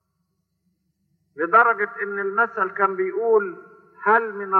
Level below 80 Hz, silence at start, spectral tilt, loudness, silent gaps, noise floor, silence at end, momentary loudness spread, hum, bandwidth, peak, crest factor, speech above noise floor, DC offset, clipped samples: -82 dBFS; 1.35 s; -8 dB/octave; -21 LUFS; none; -73 dBFS; 0 s; 10 LU; none; 4.3 kHz; -4 dBFS; 18 dB; 53 dB; under 0.1%; under 0.1%